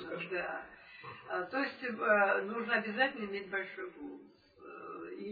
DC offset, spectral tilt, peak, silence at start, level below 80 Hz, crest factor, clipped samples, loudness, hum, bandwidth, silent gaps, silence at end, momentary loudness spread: under 0.1%; -7 dB/octave; -16 dBFS; 0 s; -76 dBFS; 20 dB; under 0.1%; -35 LUFS; none; 4.9 kHz; none; 0 s; 20 LU